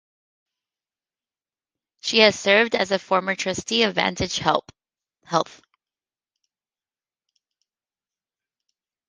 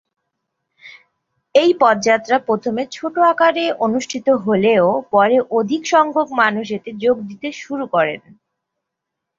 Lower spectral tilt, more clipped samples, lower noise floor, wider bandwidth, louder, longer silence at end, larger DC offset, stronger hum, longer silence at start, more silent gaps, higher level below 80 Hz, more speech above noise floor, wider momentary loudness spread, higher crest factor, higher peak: second, -3 dB/octave vs -4.5 dB/octave; neither; first, under -90 dBFS vs -80 dBFS; first, 10 kHz vs 7.6 kHz; second, -21 LUFS vs -17 LUFS; first, 3.65 s vs 1.2 s; neither; neither; first, 2.05 s vs 0.85 s; neither; first, -56 dBFS vs -64 dBFS; first, over 69 dB vs 64 dB; about the same, 9 LU vs 10 LU; first, 24 dB vs 16 dB; about the same, -2 dBFS vs -2 dBFS